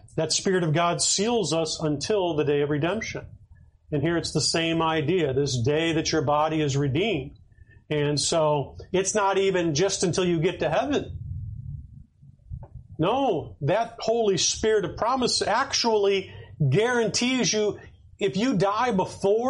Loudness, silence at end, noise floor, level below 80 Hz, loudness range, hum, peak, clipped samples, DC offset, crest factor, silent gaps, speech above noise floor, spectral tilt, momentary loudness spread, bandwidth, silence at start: -24 LUFS; 0 s; -53 dBFS; -50 dBFS; 4 LU; none; -10 dBFS; under 0.1%; under 0.1%; 14 dB; none; 29 dB; -4 dB/octave; 10 LU; 11.5 kHz; 0.15 s